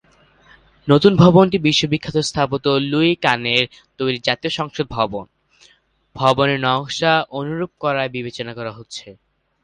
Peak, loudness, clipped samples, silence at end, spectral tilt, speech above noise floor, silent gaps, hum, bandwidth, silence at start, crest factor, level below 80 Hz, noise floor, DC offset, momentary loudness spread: 0 dBFS; -18 LUFS; under 0.1%; 0.5 s; -5.5 dB/octave; 39 dB; none; none; 10.5 kHz; 0.85 s; 18 dB; -50 dBFS; -56 dBFS; under 0.1%; 15 LU